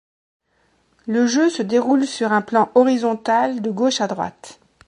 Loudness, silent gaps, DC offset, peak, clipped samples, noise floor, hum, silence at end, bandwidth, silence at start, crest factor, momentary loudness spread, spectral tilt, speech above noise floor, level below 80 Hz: -19 LUFS; none; under 0.1%; -2 dBFS; under 0.1%; -63 dBFS; none; 0.35 s; 10.5 kHz; 1.05 s; 18 dB; 8 LU; -4.5 dB/octave; 45 dB; -66 dBFS